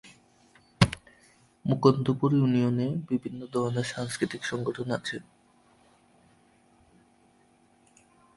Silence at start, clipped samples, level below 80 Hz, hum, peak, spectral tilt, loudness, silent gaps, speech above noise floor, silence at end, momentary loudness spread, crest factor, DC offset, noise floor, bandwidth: 0.05 s; under 0.1%; -56 dBFS; none; -2 dBFS; -6.5 dB/octave; -28 LUFS; none; 36 dB; 3.15 s; 10 LU; 28 dB; under 0.1%; -63 dBFS; 11.5 kHz